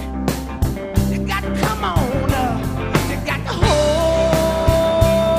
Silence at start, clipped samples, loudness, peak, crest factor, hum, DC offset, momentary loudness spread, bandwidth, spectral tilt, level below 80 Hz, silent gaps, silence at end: 0 s; under 0.1%; -18 LUFS; 0 dBFS; 16 dB; none; under 0.1%; 7 LU; 16 kHz; -5.5 dB/octave; -26 dBFS; none; 0 s